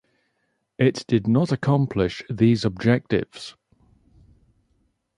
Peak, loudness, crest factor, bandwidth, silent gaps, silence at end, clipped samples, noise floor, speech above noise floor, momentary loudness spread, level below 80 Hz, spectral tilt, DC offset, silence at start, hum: -6 dBFS; -22 LUFS; 18 dB; 11 kHz; none; 1.7 s; under 0.1%; -73 dBFS; 52 dB; 7 LU; -50 dBFS; -7.5 dB/octave; under 0.1%; 0.8 s; none